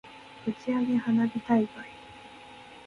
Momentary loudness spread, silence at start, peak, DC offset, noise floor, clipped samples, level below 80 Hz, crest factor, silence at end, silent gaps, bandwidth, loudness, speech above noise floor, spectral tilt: 21 LU; 0.05 s; -12 dBFS; under 0.1%; -48 dBFS; under 0.1%; -66 dBFS; 18 dB; 0.05 s; none; 6.8 kHz; -28 LUFS; 22 dB; -7.5 dB/octave